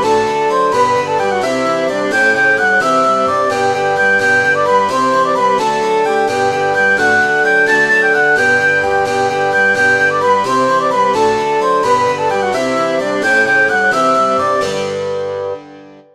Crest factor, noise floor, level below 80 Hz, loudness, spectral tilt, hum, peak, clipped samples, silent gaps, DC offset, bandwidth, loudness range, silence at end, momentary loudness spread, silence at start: 12 dB; -37 dBFS; -52 dBFS; -12 LUFS; -3.5 dB/octave; none; 0 dBFS; under 0.1%; none; under 0.1%; 14 kHz; 2 LU; 0.2 s; 5 LU; 0 s